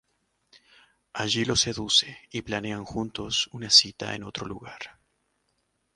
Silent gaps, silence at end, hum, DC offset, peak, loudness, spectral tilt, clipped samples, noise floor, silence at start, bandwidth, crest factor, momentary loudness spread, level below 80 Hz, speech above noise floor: none; 1.05 s; none; under 0.1%; -4 dBFS; -24 LUFS; -2 dB/octave; under 0.1%; -74 dBFS; 1.15 s; 11.5 kHz; 26 dB; 21 LU; -56 dBFS; 47 dB